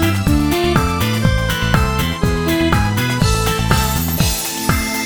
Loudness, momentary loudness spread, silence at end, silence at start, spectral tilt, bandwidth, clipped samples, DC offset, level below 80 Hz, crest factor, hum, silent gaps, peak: -16 LUFS; 2 LU; 0 s; 0 s; -4.5 dB/octave; over 20 kHz; under 0.1%; 0.3%; -24 dBFS; 16 dB; none; none; 0 dBFS